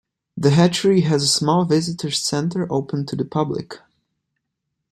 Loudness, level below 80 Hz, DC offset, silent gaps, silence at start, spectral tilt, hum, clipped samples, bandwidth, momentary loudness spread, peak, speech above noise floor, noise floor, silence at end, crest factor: -19 LUFS; -58 dBFS; under 0.1%; none; 0.35 s; -5 dB/octave; none; under 0.1%; 13 kHz; 10 LU; -2 dBFS; 59 dB; -78 dBFS; 1.15 s; 18 dB